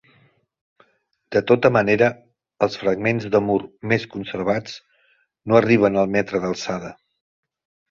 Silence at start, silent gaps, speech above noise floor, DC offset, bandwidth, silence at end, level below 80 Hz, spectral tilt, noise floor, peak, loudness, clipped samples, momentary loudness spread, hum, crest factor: 1.3 s; none; 45 dB; under 0.1%; 7.4 kHz; 1 s; -56 dBFS; -6.5 dB/octave; -64 dBFS; -2 dBFS; -20 LUFS; under 0.1%; 13 LU; none; 20 dB